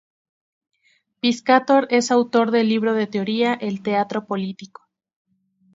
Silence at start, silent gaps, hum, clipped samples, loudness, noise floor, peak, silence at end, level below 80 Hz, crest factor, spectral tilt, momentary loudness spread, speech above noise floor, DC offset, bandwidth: 1.25 s; none; none; under 0.1%; -20 LUFS; -64 dBFS; 0 dBFS; 1.1 s; -72 dBFS; 20 dB; -5 dB/octave; 9 LU; 45 dB; under 0.1%; 7.8 kHz